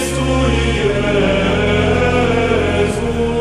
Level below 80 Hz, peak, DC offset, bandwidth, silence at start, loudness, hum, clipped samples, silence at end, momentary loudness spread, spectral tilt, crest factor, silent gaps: -26 dBFS; 0 dBFS; under 0.1%; 13 kHz; 0 s; -15 LUFS; none; under 0.1%; 0 s; 3 LU; -5.5 dB/octave; 14 dB; none